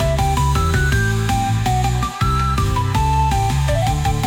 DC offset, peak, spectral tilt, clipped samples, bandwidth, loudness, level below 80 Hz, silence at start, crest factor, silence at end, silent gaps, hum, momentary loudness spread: under 0.1%; -6 dBFS; -5.5 dB/octave; under 0.1%; 18 kHz; -18 LUFS; -24 dBFS; 0 s; 10 dB; 0 s; none; none; 2 LU